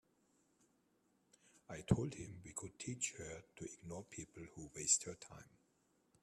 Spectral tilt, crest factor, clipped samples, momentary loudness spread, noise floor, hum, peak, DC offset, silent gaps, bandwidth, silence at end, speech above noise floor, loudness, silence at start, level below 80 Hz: -3.5 dB/octave; 28 dB; under 0.1%; 19 LU; -79 dBFS; none; -18 dBFS; under 0.1%; none; 13.5 kHz; 0.75 s; 34 dB; -42 LUFS; 1.55 s; -64 dBFS